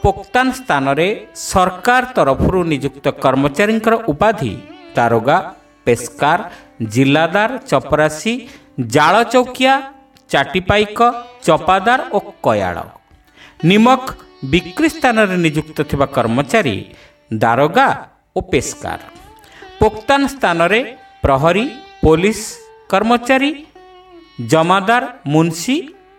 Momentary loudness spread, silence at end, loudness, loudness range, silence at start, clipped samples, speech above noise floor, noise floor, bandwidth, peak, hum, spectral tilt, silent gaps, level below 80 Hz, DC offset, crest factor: 12 LU; 0.25 s; -15 LUFS; 2 LU; 0.05 s; under 0.1%; 30 dB; -45 dBFS; 17 kHz; 0 dBFS; none; -5 dB/octave; none; -36 dBFS; under 0.1%; 16 dB